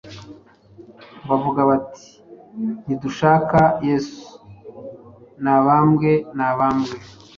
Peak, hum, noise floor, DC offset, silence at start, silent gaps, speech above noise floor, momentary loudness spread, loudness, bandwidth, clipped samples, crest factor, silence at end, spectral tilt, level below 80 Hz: -2 dBFS; none; -46 dBFS; under 0.1%; 0.05 s; none; 29 dB; 23 LU; -19 LUFS; 7.4 kHz; under 0.1%; 18 dB; 0.3 s; -8 dB/octave; -52 dBFS